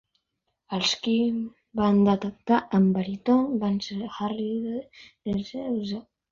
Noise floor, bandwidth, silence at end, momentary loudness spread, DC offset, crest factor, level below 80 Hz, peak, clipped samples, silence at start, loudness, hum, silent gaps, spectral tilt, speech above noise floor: -79 dBFS; 7.6 kHz; 0.3 s; 12 LU; under 0.1%; 16 dB; -58 dBFS; -10 dBFS; under 0.1%; 0.7 s; -26 LUFS; none; none; -6 dB/octave; 54 dB